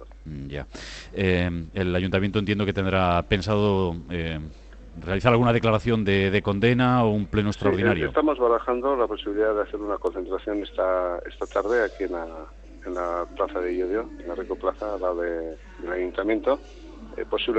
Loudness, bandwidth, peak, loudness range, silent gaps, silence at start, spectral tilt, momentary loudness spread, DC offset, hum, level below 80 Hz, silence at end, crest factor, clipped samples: -25 LUFS; 8.4 kHz; -4 dBFS; 7 LU; none; 0 s; -7.5 dB/octave; 14 LU; under 0.1%; none; -44 dBFS; 0 s; 20 dB; under 0.1%